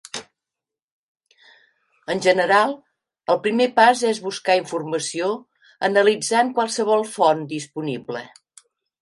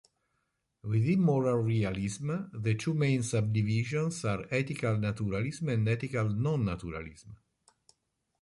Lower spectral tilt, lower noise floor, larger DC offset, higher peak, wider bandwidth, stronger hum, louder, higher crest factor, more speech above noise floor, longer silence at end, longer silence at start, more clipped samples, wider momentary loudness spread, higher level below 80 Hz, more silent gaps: second, -3.5 dB/octave vs -7 dB/octave; first, -87 dBFS vs -80 dBFS; neither; first, -2 dBFS vs -16 dBFS; about the same, 11.5 kHz vs 11.5 kHz; neither; first, -20 LUFS vs -31 LUFS; about the same, 20 dB vs 16 dB; first, 68 dB vs 50 dB; second, 0.75 s vs 1.05 s; second, 0.15 s vs 0.85 s; neither; first, 16 LU vs 8 LU; second, -72 dBFS vs -56 dBFS; first, 0.82-1.15 s vs none